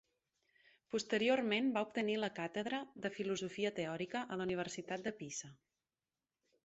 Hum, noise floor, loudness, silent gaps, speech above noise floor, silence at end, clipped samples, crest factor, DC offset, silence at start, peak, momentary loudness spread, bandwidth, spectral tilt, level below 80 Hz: none; under -90 dBFS; -39 LUFS; none; over 51 dB; 1.1 s; under 0.1%; 20 dB; under 0.1%; 0.9 s; -22 dBFS; 9 LU; 8 kHz; -3.5 dB/octave; -80 dBFS